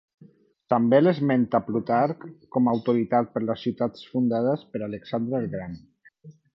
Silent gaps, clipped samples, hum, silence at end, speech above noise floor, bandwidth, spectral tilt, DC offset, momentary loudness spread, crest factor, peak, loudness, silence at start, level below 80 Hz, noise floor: none; under 0.1%; none; 0.25 s; 31 dB; 5.8 kHz; -10 dB/octave; under 0.1%; 13 LU; 18 dB; -6 dBFS; -25 LUFS; 0.7 s; -62 dBFS; -55 dBFS